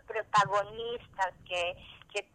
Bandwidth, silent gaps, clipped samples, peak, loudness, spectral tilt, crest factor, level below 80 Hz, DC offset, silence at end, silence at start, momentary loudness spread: 11 kHz; none; under 0.1%; -12 dBFS; -32 LUFS; -3 dB/octave; 20 dB; -62 dBFS; under 0.1%; 0.15 s; 0.1 s; 12 LU